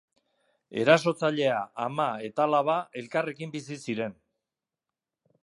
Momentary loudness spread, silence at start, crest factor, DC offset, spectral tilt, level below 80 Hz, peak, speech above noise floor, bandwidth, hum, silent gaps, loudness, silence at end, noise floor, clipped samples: 14 LU; 0.7 s; 22 dB; under 0.1%; -5.5 dB/octave; -76 dBFS; -6 dBFS; 62 dB; 11.5 kHz; none; none; -27 LUFS; 1.3 s; -89 dBFS; under 0.1%